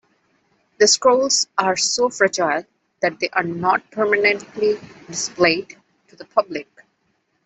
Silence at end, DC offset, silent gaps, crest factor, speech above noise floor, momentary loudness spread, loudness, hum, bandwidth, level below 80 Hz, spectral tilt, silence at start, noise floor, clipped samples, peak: 0.85 s; under 0.1%; none; 20 dB; 48 dB; 11 LU; -19 LUFS; none; 8.4 kHz; -64 dBFS; -2 dB/octave; 0.8 s; -68 dBFS; under 0.1%; -2 dBFS